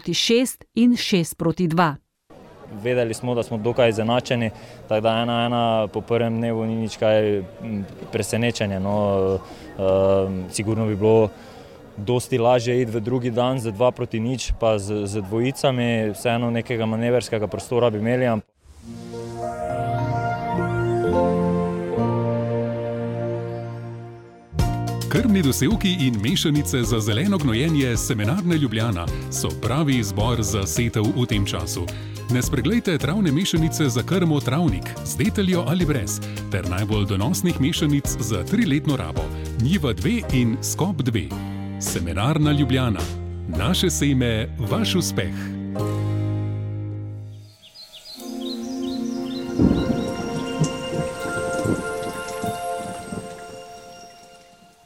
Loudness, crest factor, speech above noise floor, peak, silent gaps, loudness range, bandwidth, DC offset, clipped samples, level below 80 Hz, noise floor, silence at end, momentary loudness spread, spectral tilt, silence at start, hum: -22 LUFS; 18 dB; 29 dB; -4 dBFS; none; 5 LU; 17 kHz; under 0.1%; under 0.1%; -38 dBFS; -50 dBFS; 0.5 s; 11 LU; -5.5 dB/octave; 0.05 s; none